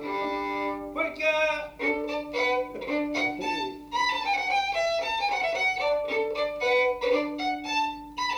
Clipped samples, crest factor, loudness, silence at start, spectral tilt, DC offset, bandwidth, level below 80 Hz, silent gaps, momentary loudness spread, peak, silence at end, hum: under 0.1%; 14 dB; -27 LUFS; 0 s; -2.5 dB/octave; under 0.1%; over 20 kHz; -58 dBFS; none; 6 LU; -14 dBFS; 0 s; none